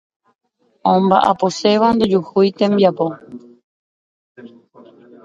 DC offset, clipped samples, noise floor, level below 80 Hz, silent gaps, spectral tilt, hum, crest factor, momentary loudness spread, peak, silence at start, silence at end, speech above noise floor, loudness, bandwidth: under 0.1%; under 0.1%; -45 dBFS; -56 dBFS; 3.64-4.35 s; -6.5 dB/octave; none; 18 dB; 9 LU; 0 dBFS; 0.85 s; 0.8 s; 30 dB; -15 LUFS; 9 kHz